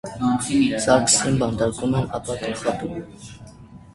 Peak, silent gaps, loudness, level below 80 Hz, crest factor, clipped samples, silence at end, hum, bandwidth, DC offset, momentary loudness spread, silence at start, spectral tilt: -2 dBFS; none; -21 LUFS; -46 dBFS; 22 dB; under 0.1%; 0.15 s; none; 11.5 kHz; under 0.1%; 18 LU; 0.05 s; -4 dB/octave